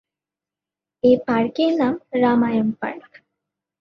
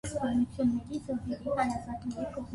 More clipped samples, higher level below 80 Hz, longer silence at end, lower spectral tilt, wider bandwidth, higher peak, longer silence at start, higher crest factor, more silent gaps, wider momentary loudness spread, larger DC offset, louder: neither; second, -62 dBFS vs -52 dBFS; first, 0.8 s vs 0 s; about the same, -7.5 dB/octave vs -6.5 dB/octave; second, 6.2 kHz vs 11.5 kHz; first, -4 dBFS vs -16 dBFS; first, 1.05 s vs 0.05 s; about the same, 18 dB vs 16 dB; neither; first, 11 LU vs 7 LU; neither; first, -20 LUFS vs -33 LUFS